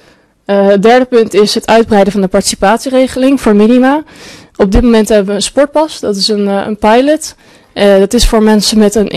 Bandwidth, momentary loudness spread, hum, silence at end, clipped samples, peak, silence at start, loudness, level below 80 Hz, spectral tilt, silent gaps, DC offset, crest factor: 13.5 kHz; 7 LU; none; 0 s; under 0.1%; 0 dBFS; 0.5 s; -9 LUFS; -24 dBFS; -4.5 dB/octave; none; under 0.1%; 8 dB